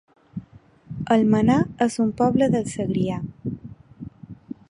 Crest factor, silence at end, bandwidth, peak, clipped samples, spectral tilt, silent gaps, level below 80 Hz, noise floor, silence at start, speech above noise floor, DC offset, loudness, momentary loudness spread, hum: 18 dB; 0.15 s; 11 kHz; -6 dBFS; under 0.1%; -7 dB/octave; none; -52 dBFS; -50 dBFS; 0.35 s; 30 dB; under 0.1%; -22 LUFS; 21 LU; none